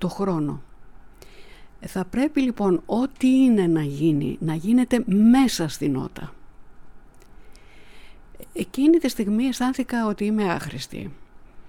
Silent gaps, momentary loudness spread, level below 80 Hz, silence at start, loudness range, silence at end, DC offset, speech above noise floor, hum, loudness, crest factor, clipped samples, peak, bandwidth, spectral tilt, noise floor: none; 16 LU; -48 dBFS; 0 s; 7 LU; 0 s; under 0.1%; 23 dB; none; -22 LUFS; 16 dB; under 0.1%; -6 dBFS; 16.5 kHz; -6 dB/octave; -44 dBFS